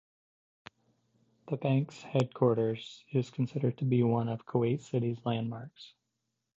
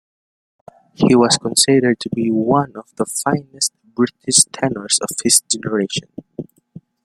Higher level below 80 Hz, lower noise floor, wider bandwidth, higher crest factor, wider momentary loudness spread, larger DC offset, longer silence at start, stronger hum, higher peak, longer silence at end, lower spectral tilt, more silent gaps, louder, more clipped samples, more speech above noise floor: second, -70 dBFS vs -56 dBFS; first, -84 dBFS vs -43 dBFS; second, 7.8 kHz vs 16.5 kHz; about the same, 20 dB vs 18 dB; second, 10 LU vs 14 LU; neither; first, 1.45 s vs 1 s; neither; second, -12 dBFS vs 0 dBFS; about the same, 0.7 s vs 0.6 s; first, -8.5 dB/octave vs -3 dB/octave; neither; second, -32 LUFS vs -16 LUFS; neither; first, 53 dB vs 26 dB